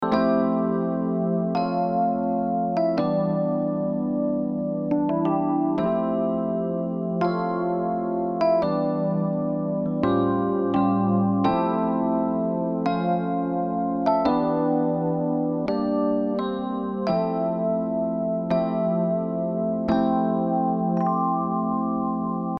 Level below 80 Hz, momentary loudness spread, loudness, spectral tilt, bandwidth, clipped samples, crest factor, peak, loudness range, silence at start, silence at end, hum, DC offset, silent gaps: -56 dBFS; 4 LU; -24 LUFS; -10 dB/octave; 6 kHz; under 0.1%; 16 dB; -8 dBFS; 2 LU; 0 s; 0 s; none; under 0.1%; none